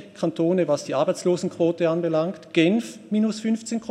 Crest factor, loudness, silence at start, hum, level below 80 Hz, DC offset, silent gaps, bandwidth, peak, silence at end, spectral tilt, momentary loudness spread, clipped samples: 18 dB; -23 LUFS; 0 s; none; -74 dBFS; under 0.1%; none; 12 kHz; -6 dBFS; 0 s; -6 dB/octave; 5 LU; under 0.1%